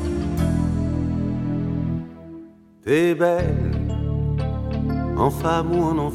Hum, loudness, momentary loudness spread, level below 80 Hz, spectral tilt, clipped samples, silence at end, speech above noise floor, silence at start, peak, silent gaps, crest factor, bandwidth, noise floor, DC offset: none; -22 LUFS; 9 LU; -32 dBFS; -8 dB/octave; under 0.1%; 0 s; 24 dB; 0 s; -6 dBFS; none; 16 dB; 15 kHz; -44 dBFS; under 0.1%